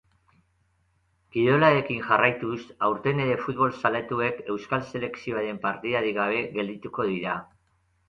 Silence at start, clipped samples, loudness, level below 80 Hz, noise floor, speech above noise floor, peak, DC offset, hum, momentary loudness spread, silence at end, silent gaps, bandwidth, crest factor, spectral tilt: 1.35 s; under 0.1%; -26 LUFS; -62 dBFS; -69 dBFS; 43 dB; -6 dBFS; under 0.1%; none; 11 LU; 0.65 s; none; 7.4 kHz; 20 dB; -7.5 dB/octave